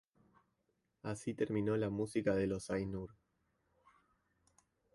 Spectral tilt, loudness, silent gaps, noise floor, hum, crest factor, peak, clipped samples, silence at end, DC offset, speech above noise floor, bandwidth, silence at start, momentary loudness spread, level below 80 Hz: -7 dB/octave; -38 LUFS; none; -83 dBFS; none; 20 dB; -22 dBFS; under 0.1%; 1.85 s; under 0.1%; 45 dB; 11.5 kHz; 1.05 s; 11 LU; -64 dBFS